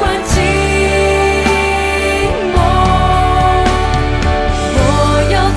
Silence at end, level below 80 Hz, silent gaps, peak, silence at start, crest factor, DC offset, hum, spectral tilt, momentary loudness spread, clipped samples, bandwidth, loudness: 0 s; -18 dBFS; none; 0 dBFS; 0 s; 12 dB; under 0.1%; none; -5 dB/octave; 3 LU; under 0.1%; 11 kHz; -12 LUFS